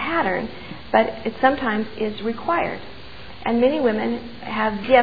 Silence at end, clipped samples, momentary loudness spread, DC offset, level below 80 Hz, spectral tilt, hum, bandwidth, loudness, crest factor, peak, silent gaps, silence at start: 0 s; under 0.1%; 15 LU; 1%; -48 dBFS; -8 dB/octave; none; 5 kHz; -22 LUFS; 20 dB; -2 dBFS; none; 0 s